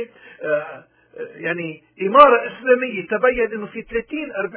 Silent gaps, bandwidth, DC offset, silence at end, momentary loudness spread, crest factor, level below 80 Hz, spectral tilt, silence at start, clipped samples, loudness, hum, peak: none; 4 kHz; under 0.1%; 0 s; 20 LU; 20 dB; -52 dBFS; -8.5 dB/octave; 0 s; under 0.1%; -18 LUFS; none; 0 dBFS